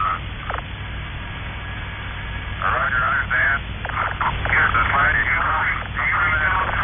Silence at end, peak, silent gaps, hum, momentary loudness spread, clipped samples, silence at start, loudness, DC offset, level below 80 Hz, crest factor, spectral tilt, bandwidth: 0 s; -8 dBFS; none; none; 14 LU; under 0.1%; 0 s; -20 LUFS; under 0.1%; -32 dBFS; 14 dB; 0.5 dB/octave; 3.7 kHz